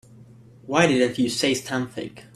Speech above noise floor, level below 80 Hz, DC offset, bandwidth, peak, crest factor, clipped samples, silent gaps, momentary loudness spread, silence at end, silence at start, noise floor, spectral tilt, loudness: 25 dB; -60 dBFS; under 0.1%; 14.5 kHz; -4 dBFS; 20 dB; under 0.1%; none; 11 LU; 0.15 s; 0.2 s; -48 dBFS; -4 dB/octave; -22 LUFS